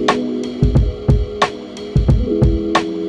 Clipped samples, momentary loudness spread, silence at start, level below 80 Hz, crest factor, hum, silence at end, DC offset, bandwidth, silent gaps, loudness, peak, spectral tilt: under 0.1%; 5 LU; 0 s; -20 dBFS; 16 dB; none; 0 s; under 0.1%; 9.2 kHz; none; -17 LUFS; 0 dBFS; -7 dB/octave